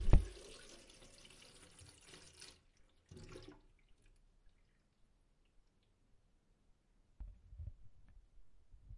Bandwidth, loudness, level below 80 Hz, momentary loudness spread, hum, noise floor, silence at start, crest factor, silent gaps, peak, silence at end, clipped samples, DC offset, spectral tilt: 11.5 kHz; -48 LUFS; -46 dBFS; 14 LU; none; -74 dBFS; 0 s; 30 dB; none; -14 dBFS; 1.1 s; under 0.1%; under 0.1%; -6 dB/octave